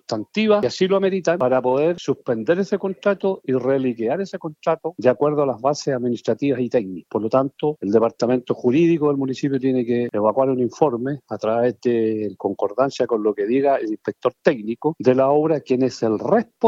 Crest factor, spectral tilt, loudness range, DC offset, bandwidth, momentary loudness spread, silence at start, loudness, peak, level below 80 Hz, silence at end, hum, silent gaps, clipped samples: 18 dB; -7 dB/octave; 2 LU; under 0.1%; 7.8 kHz; 6 LU; 0.1 s; -20 LUFS; -2 dBFS; -68 dBFS; 0 s; none; none; under 0.1%